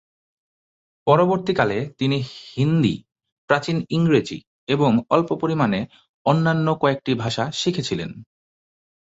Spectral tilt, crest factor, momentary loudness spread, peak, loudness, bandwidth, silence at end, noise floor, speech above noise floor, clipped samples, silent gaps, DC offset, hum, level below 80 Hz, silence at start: -6.5 dB/octave; 20 dB; 9 LU; -2 dBFS; -21 LUFS; 8 kHz; 0.95 s; under -90 dBFS; over 70 dB; under 0.1%; 3.32-3.48 s, 4.47-4.67 s, 6.09-6.25 s; under 0.1%; none; -56 dBFS; 1.05 s